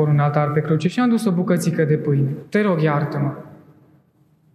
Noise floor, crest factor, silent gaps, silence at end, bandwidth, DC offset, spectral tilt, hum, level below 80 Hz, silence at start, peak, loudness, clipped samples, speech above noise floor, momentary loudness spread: -58 dBFS; 16 dB; none; 1 s; 13 kHz; under 0.1%; -7.5 dB/octave; none; -66 dBFS; 0 s; -4 dBFS; -19 LUFS; under 0.1%; 39 dB; 5 LU